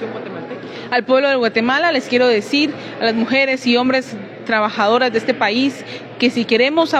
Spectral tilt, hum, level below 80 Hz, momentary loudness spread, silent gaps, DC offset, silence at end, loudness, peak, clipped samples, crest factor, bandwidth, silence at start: -4.5 dB/octave; none; -64 dBFS; 14 LU; none; under 0.1%; 0 s; -16 LUFS; -2 dBFS; under 0.1%; 14 dB; 11 kHz; 0 s